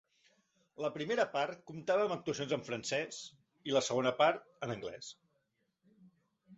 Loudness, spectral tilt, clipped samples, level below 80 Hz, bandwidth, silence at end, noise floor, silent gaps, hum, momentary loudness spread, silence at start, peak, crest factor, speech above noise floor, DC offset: -35 LUFS; -3 dB/octave; under 0.1%; -76 dBFS; 8 kHz; 0 s; -81 dBFS; none; none; 15 LU; 0.8 s; -16 dBFS; 22 dB; 45 dB; under 0.1%